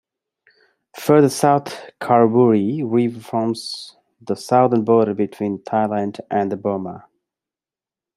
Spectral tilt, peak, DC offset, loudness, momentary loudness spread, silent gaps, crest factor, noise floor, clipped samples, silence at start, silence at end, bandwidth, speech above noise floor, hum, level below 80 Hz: -6.5 dB/octave; -2 dBFS; under 0.1%; -18 LUFS; 14 LU; none; 18 dB; under -90 dBFS; under 0.1%; 0.95 s; 1.2 s; 15 kHz; over 72 dB; none; -66 dBFS